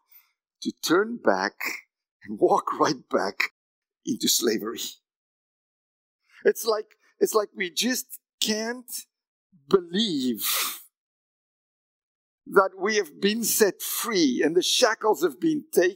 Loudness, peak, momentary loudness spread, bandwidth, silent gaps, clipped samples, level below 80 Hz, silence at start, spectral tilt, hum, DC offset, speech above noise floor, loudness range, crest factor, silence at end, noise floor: -25 LUFS; -2 dBFS; 12 LU; 16.5 kHz; 2.11-2.20 s, 3.51-3.82 s, 5.16-6.19 s, 8.33-8.38 s, 9.27-9.50 s, 10.97-12.38 s; under 0.1%; -80 dBFS; 0.6 s; -2.5 dB/octave; none; under 0.1%; 35 dB; 5 LU; 24 dB; 0 s; -59 dBFS